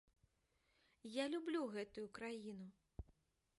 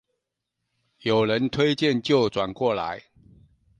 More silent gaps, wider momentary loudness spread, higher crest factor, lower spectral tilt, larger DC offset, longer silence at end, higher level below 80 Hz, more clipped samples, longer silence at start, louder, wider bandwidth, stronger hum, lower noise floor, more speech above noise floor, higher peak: neither; first, 17 LU vs 10 LU; about the same, 20 dB vs 18 dB; about the same, -5 dB/octave vs -6 dB/octave; neither; second, 0.55 s vs 0.8 s; second, -68 dBFS vs -58 dBFS; neither; about the same, 1.05 s vs 1.05 s; second, -47 LUFS vs -23 LUFS; first, 11.5 kHz vs 9.8 kHz; neither; about the same, -82 dBFS vs -82 dBFS; second, 36 dB vs 59 dB; second, -30 dBFS vs -8 dBFS